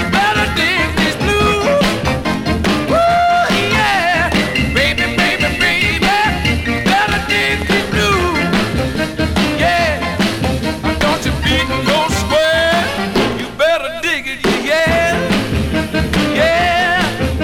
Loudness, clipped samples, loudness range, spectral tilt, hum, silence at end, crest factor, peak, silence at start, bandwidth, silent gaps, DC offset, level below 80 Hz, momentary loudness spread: -14 LUFS; under 0.1%; 2 LU; -4.5 dB/octave; none; 0 s; 12 dB; -2 dBFS; 0 s; 18 kHz; none; under 0.1%; -28 dBFS; 5 LU